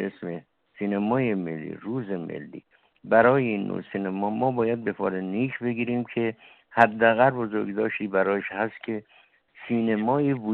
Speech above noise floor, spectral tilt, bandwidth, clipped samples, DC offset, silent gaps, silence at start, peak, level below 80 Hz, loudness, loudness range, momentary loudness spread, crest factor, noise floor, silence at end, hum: 24 dB; -5.5 dB/octave; 4.5 kHz; under 0.1%; under 0.1%; none; 0 s; -4 dBFS; -66 dBFS; -25 LUFS; 3 LU; 15 LU; 22 dB; -48 dBFS; 0 s; none